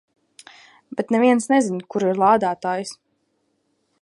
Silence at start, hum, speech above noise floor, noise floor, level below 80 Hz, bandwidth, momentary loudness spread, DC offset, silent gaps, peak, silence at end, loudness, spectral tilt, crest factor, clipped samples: 0.95 s; none; 50 dB; -69 dBFS; -68 dBFS; 11.5 kHz; 12 LU; under 0.1%; none; -4 dBFS; 1.1 s; -20 LUFS; -5.5 dB/octave; 18 dB; under 0.1%